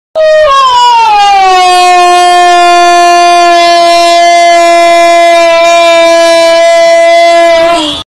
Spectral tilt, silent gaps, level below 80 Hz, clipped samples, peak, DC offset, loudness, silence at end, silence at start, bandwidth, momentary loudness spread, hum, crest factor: -1 dB/octave; none; -40 dBFS; 0.2%; 0 dBFS; under 0.1%; -3 LUFS; 0.05 s; 0.15 s; 12.5 kHz; 1 LU; none; 4 dB